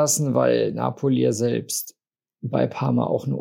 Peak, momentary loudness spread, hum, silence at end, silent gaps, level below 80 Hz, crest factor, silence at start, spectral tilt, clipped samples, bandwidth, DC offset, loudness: -6 dBFS; 8 LU; none; 0 s; none; -68 dBFS; 16 dB; 0 s; -5.5 dB/octave; under 0.1%; 16.5 kHz; under 0.1%; -22 LUFS